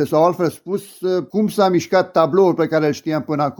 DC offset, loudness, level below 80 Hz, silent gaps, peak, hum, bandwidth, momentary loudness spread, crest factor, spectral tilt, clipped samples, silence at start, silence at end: under 0.1%; -18 LUFS; -64 dBFS; none; 0 dBFS; none; 19.5 kHz; 8 LU; 16 dB; -6.5 dB/octave; under 0.1%; 0 s; 0.05 s